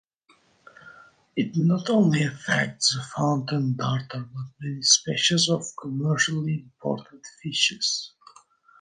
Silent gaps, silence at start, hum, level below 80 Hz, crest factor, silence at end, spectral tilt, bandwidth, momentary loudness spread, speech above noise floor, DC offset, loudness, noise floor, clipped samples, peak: none; 0.85 s; none; -66 dBFS; 22 dB; 0.75 s; -3.5 dB/octave; 10.5 kHz; 14 LU; 38 dB; under 0.1%; -24 LUFS; -62 dBFS; under 0.1%; -4 dBFS